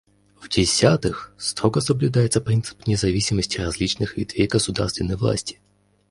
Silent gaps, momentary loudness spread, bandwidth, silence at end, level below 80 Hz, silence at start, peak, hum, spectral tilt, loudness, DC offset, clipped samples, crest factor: none; 8 LU; 11.5 kHz; 0.6 s; -40 dBFS; 0.4 s; -2 dBFS; none; -5 dB/octave; -22 LUFS; under 0.1%; under 0.1%; 20 dB